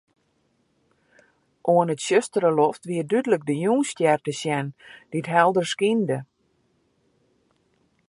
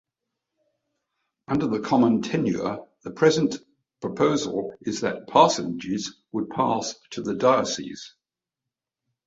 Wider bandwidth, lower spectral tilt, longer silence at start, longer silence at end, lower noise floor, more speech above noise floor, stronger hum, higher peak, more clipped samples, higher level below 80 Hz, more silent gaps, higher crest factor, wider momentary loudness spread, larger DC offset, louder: first, 11.5 kHz vs 8 kHz; about the same, -5 dB/octave vs -5 dB/octave; first, 1.65 s vs 1.5 s; first, 1.85 s vs 1.2 s; second, -68 dBFS vs -87 dBFS; second, 46 dB vs 64 dB; neither; about the same, -2 dBFS vs -2 dBFS; neither; second, -74 dBFS vs -62 dBFS; neither; about the same, 22 dB vs 24 dB; second, 10 LU vs 14 LU; neither; about the same, -23 LUFS vs -24 LUFS